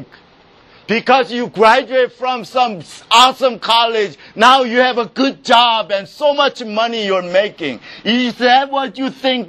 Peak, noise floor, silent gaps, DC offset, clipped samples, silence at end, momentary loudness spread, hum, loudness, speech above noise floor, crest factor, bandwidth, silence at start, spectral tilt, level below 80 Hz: 0 dBFS; -47 dBFS; none; under 0.1%; 0.1%; 0 s; 10 LU; none; -14 LUFS; 33 dB; 14 dB; 15.5 kHz; 0 s; -3 dB/octave; -60 dBFS